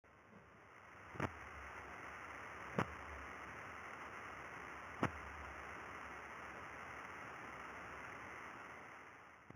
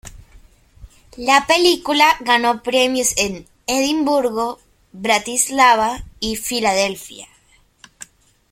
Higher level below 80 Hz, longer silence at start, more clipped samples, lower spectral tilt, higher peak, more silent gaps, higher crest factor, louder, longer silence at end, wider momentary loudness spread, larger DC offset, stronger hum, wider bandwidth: second, -66 dBFS vs -46 dBFS; about the same, 0.05 s vs 0.05 s; neither; first, -5.5 dB/octave vs -1.5 dB/octave; second, -20 dBFS vs 0 dBFS; neither; first, 30 dB vs 18 dB; second, -49 LUFS vs -17 LUFS; second, 0 s vs 1.25 s; about the same, 14 LU vs 13 LU; neither; neither; first, over 20 kHz vs 16.5 kHz